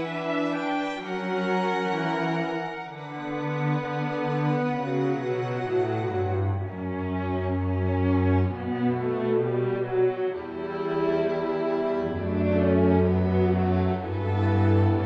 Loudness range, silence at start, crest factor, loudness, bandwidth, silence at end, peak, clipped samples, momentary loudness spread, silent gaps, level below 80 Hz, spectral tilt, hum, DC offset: 4 LU; 0 s; 14 dB; -26 LUFS; 7.4 kHz; 0 s; -10 dBFS; under 0.1%; 8 LU; none; -52 dBFS; -8.5 dB/octave; none; under 0.1%